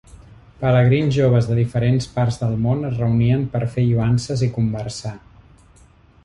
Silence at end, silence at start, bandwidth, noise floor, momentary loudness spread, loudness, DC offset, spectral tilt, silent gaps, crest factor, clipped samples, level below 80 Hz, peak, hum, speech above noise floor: 1.1 s; 0.6 s; 10.5 kHz; -50 dBFS; 7 LU; -19 LUFS; under 0.1%; -7.5 dB/octave; none; 14 dB; under 0.1%; -42 dBFS; -4 dBFS; none; 32 dB